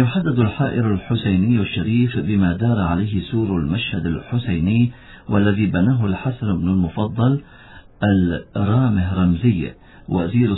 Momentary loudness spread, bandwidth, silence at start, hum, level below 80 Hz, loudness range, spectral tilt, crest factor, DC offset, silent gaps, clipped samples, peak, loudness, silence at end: 6 LU; 4.1 kHz; 0 s; none; -40 dBFS; 1 LU; -11.5 dB/octave; 16 dB; under 0.1%; none; under 0.1%; -2 dBFS; -19 LUFS; 0 s